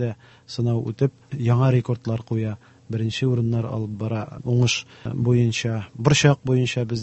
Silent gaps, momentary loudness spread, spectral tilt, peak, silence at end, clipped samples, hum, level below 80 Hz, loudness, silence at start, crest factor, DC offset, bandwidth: none; 10 LU; -6 dB/octave; -2 dBFS; 0 s; under 0.1%; none; -50 dBFS; -23 LUFS; 0 s; 20 dB; under 0.1%; 8.4 kHz